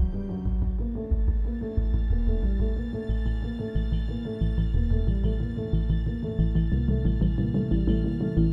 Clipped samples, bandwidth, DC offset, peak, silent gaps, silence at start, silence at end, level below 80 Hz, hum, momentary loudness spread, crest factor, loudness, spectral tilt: under 0.1%; 4.4 kHz; under 0.1%; -10 dBFS; none; 0 s; 0 s; -26 dBFS; none; 5 LU; 14 dB; -27 LUFS; -10.5 dB/octave